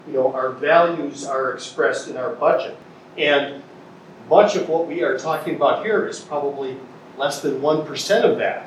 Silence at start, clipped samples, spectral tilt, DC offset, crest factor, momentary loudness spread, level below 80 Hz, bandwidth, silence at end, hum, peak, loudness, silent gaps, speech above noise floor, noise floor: 0.05 s; under 0.1%; -4 dB/octave; under 0.1%; 20 dB; 12 LU; -74 dBFS; 14 kHz; 0 s; none; 0 dBFS; -20 LUFS; none; 23 dB; -42 dBFS